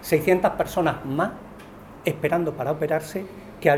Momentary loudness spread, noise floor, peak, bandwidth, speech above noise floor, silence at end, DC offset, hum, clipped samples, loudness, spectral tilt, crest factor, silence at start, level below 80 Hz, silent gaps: 20 LU; -43 dBFS; -2 dBFS; over 20 kHz; 20 dB; 0 s; under 0.1%; none; under 0.1%; -24 LUFS; -6 dB/octave; 22 dB; 0 s; -52 dBFS; none